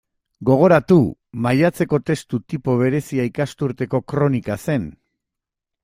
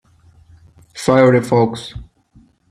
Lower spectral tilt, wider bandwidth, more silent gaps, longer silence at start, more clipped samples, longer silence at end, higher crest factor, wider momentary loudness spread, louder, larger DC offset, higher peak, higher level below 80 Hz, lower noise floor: first, -8 dB/octave vs -6.5 dB/octave; first, 16 kHz vs 13.5 kHz; neither; second, 0.4 s vs 0.95 s; neither; first, 0.9 s vs 0.7 s; about the same, 18 dB vs 18 dB; second, 11 LU vs 24 LU; second, -19 LUFS vs -14 LUFS; neither; about the same, -2 dBFS vs 0 dBFS; second, -52 dBFS vs -46 dBFS; first, -84 dBFS vs -51 dBFS